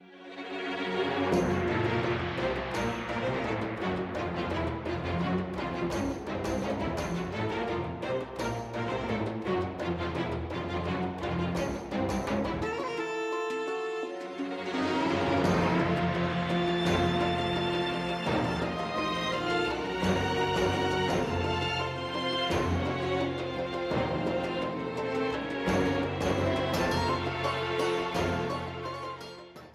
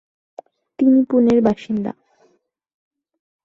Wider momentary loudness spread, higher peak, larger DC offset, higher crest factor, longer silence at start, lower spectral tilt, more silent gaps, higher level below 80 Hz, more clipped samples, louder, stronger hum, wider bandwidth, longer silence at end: second, 6 LU vs 10 LU; second, -14 dBFS vs -4 dBFS; neither; about the same, 16 dB vs 16 dB; second, 0 s vs 0.8 s; second, -6 dB/octave vs -8.5 dB/octave; neither; first, -48 dBFS vs -56 dBFS; neither; second, -31 LUFS vs -17 LUFS; neither; first, 14 kHz vs 7.2 kHz; second, 0 s vs 1.55 s